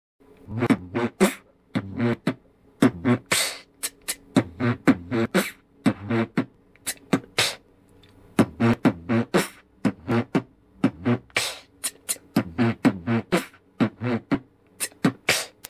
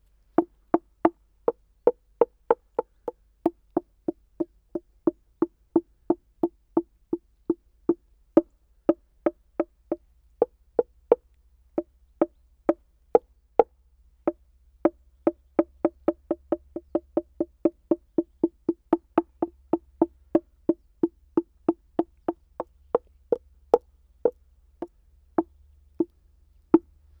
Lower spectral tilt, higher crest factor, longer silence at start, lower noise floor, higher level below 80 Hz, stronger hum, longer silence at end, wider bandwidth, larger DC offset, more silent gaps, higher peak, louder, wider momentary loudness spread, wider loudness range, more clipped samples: second, -4.5 dB/octave vs -9.5 dB/octave; second, 18 dB vs 28 dB; about the same, 0.5 s vs 0.4 s; second, -55 dBFS vs -60 dBFS; first, -54 dBFS vs -60 dBFS; neither; second, 0.2 s vs 0.4 s; first, 16 kHz vs 3.6 kHz; neither; neither; second, -6 dBFS vs 0 dBFS; first, -25 LUFS vs -29 LUFS; about the same, 10 LU vs 10 LU; about the same, 2 LU vs 3 LU; neither